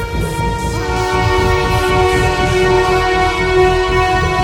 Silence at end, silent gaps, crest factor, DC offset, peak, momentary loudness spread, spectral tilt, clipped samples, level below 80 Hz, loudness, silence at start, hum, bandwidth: 0 s; none; 12 dB; under 0.1%; 0 dBFS; 6 LU; -5.5 dB/octave; under 0.1%; -24 dBFS; -14 LUFS; 0 s; none; 16.5 kHz